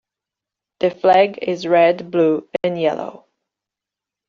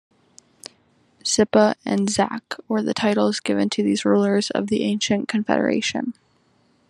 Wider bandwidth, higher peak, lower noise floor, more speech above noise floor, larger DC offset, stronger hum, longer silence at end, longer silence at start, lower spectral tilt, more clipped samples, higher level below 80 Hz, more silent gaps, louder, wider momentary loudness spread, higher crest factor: second, 7.2 kHz vs 11.5 kHz; about the same, -2 dBFS vs -2 dBFS; first, -86 dBFS vs -61 dBFS; first, 70 dB vs 41 dB; neither; neither; first, 1.15 s vs 0.8 s; second, 0.8 s vs 1.25 s; about the same, -4 dB/octave vs -4.5 dB/octave; neither; about the same, -66 dBFS vs -64 dBFS; neither; first, -17 LUFS vs -21 LUFS; second, 9 LU vs 12 LU; about the same, 16 dB vs 20 dB